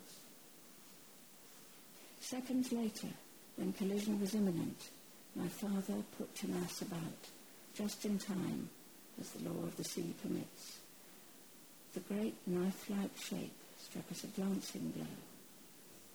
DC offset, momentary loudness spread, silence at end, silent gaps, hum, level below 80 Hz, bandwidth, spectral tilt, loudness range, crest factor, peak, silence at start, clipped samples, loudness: under 0.1%; 19 LU; 0 s; none; none; -76 dBFS; over 20 kHz; -5 dB/octave; 5 LU; 16 dB; -28 dBFS; 0 s; under 0.1%; -42 LUFS